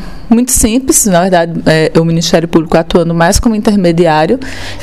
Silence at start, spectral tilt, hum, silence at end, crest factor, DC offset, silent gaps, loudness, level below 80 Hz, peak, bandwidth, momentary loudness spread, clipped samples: 0 s; -4.5 dB/octave; none; 0 s; 10 dB; 3%; none; -9 LUFS; -26 dBFS; 0 dBFS; 16 kHz; 3 LU; 0.4%